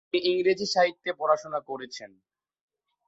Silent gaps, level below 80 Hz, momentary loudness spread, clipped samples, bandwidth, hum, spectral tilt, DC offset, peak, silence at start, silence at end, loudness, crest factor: none; -74 dBFS; 13 LU; under 0.1%; 8.2 kHz; none; -3.5 dB/octave; under 0.1%; -10 dBFS; 0.15 s; 1 s; -26 LUFS; 20 dB